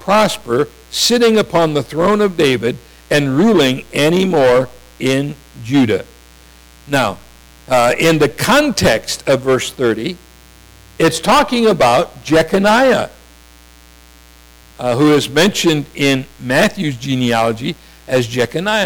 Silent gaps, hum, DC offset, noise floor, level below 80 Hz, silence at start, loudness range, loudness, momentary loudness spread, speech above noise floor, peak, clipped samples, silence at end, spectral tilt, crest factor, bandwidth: none; none; under 0.1%; -43 dBFS; -42 dBFS; 0 s; 3 LU; -14 LUFS; 9 LU; 29 dB; -4 dBFS; under 0.1%; 0 s; -4.5 dB/octave; 10 dB; over 20 kHz